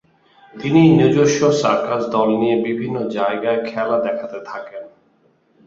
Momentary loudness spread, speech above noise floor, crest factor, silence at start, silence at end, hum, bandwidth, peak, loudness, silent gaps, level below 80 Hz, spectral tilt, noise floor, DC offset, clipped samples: 17 LU; 41 dB; 16 dB; 0.55 s; 0.8 s; none; 7.8 kHz; -2 dBFS; -17 LUFS; none; -56 dBFS; -6.5 dB/octave; -58 dBFS; under 0.1%; under 0.1%